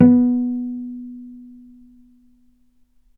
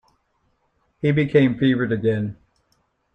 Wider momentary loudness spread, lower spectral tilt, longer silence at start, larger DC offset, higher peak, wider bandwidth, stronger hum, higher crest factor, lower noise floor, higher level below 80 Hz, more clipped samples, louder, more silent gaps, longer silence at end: first, 26 LU vs 9 LU; first, -12.5 dB/octave vs -9 dB/octave; second, 0 s vs 1.05 s; neither; first, 0 dBFS vs -4 dBFS; second, 2.4 kHz vs 5.6 kHz; neither; about the same, 20 dB vs 18 dB; second, -59 dBFS vs -68 dBFS; second, -60 dBFS vs -54 dBFS; neither; about the same, -20 LUFS vs -20 LUFS; neither; first, 1.7 s vs 0.8 s